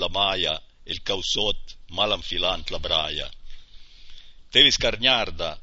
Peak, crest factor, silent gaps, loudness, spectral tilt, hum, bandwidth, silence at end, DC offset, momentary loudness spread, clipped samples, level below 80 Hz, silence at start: -2 dBFS; 22 dB; none; -22 LUFS; -2 dB/octave; none; 8 kHz; 0 s; under 0.1%; 16 LU; under 0.1%; -38 dBFS; 0 s